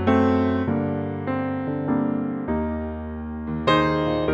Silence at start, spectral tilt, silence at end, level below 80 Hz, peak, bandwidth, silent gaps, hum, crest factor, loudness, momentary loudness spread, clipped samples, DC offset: 0 s; -8 dB/octave; 0 s; -42 dBFS; -4 dBFS; 7.8 kHz; none; none; 18 dB; -24 LUFS; 11 LU; under 0.1%; under 0.1%